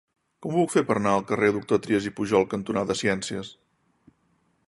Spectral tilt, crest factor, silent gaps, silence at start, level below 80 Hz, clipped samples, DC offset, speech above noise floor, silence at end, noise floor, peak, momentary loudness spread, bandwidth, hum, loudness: -5.5 dB/octave; 20 dB; none; 0.4 s; -58 dBFS; under 0.1%; under 0.1%; 44 dB; 1.15 s; -68 dBFS; -6 dBFS; 9 LU; 11.5 kHz; none; -25 LUFS